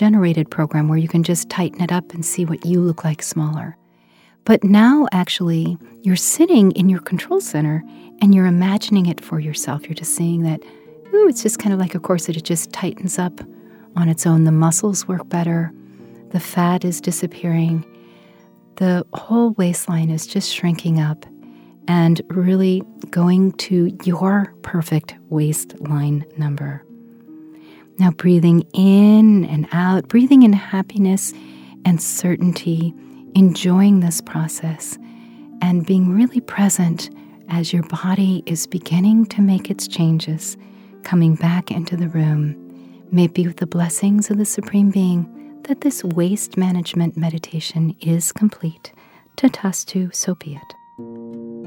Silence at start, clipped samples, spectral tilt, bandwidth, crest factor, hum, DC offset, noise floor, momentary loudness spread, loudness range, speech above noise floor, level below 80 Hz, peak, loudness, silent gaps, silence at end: 0 s; under 0.1%; -6 dB/octave; 17 kHz; 16 dB; none; under 0.1%; -53 dBFS; 12 LU; 6 LU; 37 dB; -64 dBFS; 0 dBFS; -17 LUFS; none; 0 s